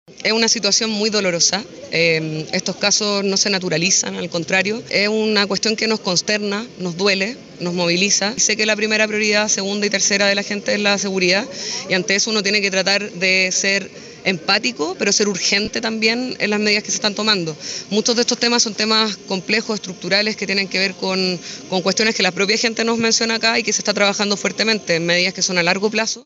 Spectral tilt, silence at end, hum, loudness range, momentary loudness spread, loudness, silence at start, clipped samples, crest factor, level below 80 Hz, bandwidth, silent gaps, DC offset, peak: -2 dB/octave; 0.05 s; none; 2 LU; 6 LU; -17 LUFS; 0.1 s; under 0.1%; 16 dB; -62 dBFS; 8.2 kHz; none; under 0.1%; -2 dBFS